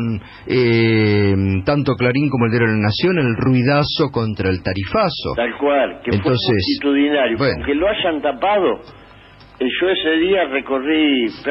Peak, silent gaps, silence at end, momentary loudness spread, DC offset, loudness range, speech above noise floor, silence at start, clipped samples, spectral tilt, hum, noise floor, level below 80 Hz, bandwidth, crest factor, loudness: -4 dBFS; none; 0 s; 5 LU; under 0.1%; 2 LU; 27 dB; 0 s; under 0.1%; -9.5 dB/octave; none; -43 dBFS; -44 dBFS; 5.8 kHz; 12 dB; -17 LUFS